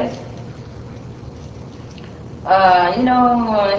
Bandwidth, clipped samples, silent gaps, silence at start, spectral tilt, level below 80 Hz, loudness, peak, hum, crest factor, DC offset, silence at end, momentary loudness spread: 7.6 kHz; under 0.1%; none; 0 s; -6.5 dB/octave; -42 dBFS; -14 LUFS; 0 dBFS; none; 18 dB; under 0.1%; 0 s; 22 LU